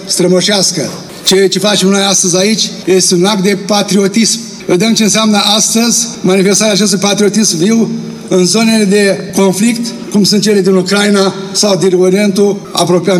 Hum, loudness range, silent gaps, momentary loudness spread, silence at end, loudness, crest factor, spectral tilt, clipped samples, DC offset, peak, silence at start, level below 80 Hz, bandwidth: none; 1 LU; none; 5 LU; 0 s; -9 LUFS; 10 dB; -3.5 dB/octave; under 0.1%; under 0.1%; 0 dBFS; 0 s; -56 dBFS; 16 kHz